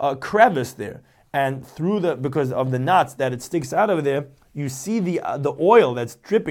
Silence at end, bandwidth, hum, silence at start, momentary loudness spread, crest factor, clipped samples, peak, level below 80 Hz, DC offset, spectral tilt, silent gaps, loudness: 0 s; 17 kHz; none; 0 s; 13 LU; 18 dB; under 0.1%; -2 dBFS; -60 dBFS; under 0.1%; -6 dB/octave; none; -21 LUFS